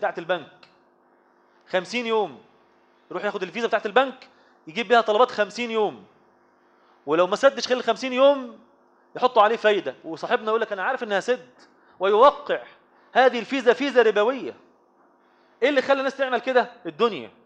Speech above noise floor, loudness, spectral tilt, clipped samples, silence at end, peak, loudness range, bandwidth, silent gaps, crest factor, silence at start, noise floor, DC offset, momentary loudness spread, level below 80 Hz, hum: 38 dB; -22 LUFS; -4 dB/octave; under 0.1%; 0.2 s; -4 dBFS; 5 LU; 9 kHz; none; 20 dB; 0 s; -60 dBFS; under 0.1%; 11 LU; -76 dBFS; 50 Hz at -65 dBFS